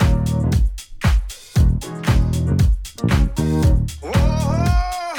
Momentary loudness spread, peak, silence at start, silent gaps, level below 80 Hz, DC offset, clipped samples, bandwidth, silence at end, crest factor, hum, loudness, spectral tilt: 5 LU; -4 dBFS; 0 s; none; -20 dBFS; under 0.1%; under 0.1%; 17.5 kHz; 0 s; 12 dB; none; -19 LUFS; -6.5 dB/octave